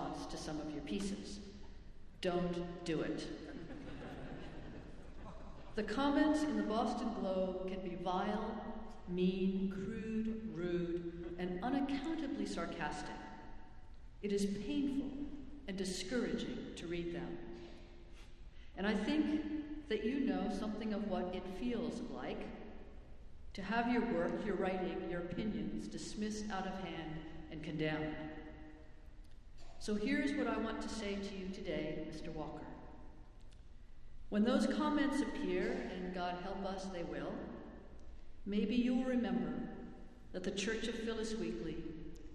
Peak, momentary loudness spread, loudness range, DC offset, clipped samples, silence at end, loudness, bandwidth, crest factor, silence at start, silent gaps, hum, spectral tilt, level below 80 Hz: -20 dBFS; 19 LU; 5 LU; under 0.1%; under 0.1%; 0 s; -40 LUFS; 12 kHz; 20 dB; 0 s; none; none; -5.5 dB/octave; -56 dBFS